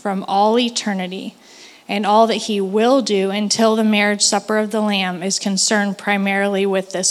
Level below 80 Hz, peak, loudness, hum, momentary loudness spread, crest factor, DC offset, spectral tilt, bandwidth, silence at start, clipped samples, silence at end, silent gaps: -76 dBFS; -2 dBFS; -17 LUFS; none; 7 LU; 16 dB; under 0.1%; -3.5 dB/octave; 14 kHz; 0.05 s; under 0.1%; 0 s; none